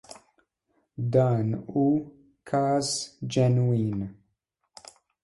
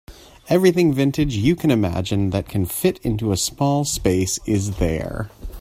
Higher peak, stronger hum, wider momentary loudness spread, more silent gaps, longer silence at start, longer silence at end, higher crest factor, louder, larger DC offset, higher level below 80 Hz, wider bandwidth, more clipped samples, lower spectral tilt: second, -10 dBFS vs -2 dBFS; neither; first, 12 LU vs 6 LU; neither; first, 1 s vs 0.1 s; first, 1.1 s vs 0 s; about the same, 18 dB vs 18 dB; second, -26 LUFS vs -20 LUFS; neither; second, -60 dBFS vs -36 dBFS; second, 11.5 kHz vs 16 kHz; neither; about the same, -6.5 dB/octave vs -5.5 dB/octave